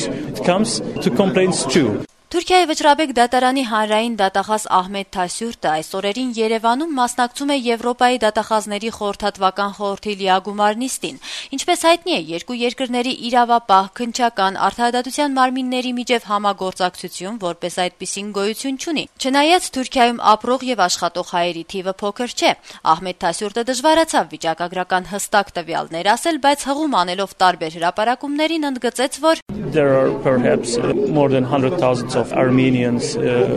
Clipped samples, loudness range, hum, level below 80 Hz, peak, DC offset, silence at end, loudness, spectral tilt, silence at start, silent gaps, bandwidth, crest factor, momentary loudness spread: under 0.1%; 3 LU; none; -52 dBFS; -2 dBFS; under 0.1%; 0 s; -18 LUFS; -4 dB/octave; 0 s; 29.42-29.46 s; 13.5 kHz; 16 dB; 8 LU